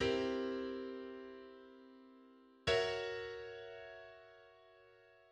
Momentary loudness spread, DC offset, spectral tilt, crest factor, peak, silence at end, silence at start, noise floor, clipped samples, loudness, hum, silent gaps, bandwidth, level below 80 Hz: 25 LU; under 0.1%; -4.5 dB/octave; 20 dB; -22 dBFS; 0.2 s; 0 s; -65 dBFS; under 0.1%; -41 LUFS; none; none; 10 kHz; -66 dBFS